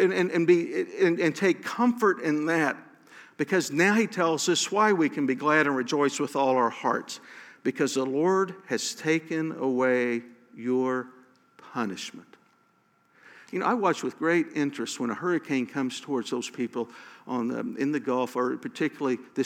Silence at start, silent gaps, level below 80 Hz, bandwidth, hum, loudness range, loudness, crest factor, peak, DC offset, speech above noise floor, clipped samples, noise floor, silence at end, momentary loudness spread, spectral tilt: 0 s; none; -88 dBFS; 16.5 kHz; none; 6 LU; -26 LUFS; 18 dB; -8 dBFS; under 0.1%; 40 dB; under 0.1%; -66 dBFS; 0 s; 10 LU; -4.5 dB/octave